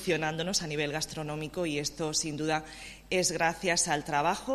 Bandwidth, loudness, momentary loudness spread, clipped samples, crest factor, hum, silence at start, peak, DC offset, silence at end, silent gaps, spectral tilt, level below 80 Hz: 14.5 kHz; -30 LUFS; 8 LU; under 0.1%; 18 dB; none; 0 s; -12 dBFS; under 0.1%; 0 s; none; -3 dB/octave; -56 dBFS